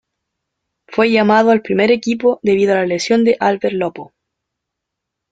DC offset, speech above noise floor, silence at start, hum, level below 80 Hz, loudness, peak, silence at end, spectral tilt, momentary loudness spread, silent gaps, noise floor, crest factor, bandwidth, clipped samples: under 0.1%; 65 dB; 0.9 s; none; -58 dBFS; -15 LUFS; 0 dBFS; 1.25 s; -5.5 dB/octave; 8 LU; none; -79 dBFS; 16 dB; 9.2 kHz; under 0.1%